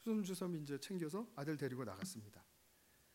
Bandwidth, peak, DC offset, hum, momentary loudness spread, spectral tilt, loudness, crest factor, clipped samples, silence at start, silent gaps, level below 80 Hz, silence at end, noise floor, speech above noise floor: 16 kHz; -30 dBFS; under 0.1%; none; 11 LU; -5.5 dB/octave; -45 LUFS; 16 dB; under 0.1%; 0 s; none; -84 dBFS; 0.7 s; -72 dBFS; 27 dB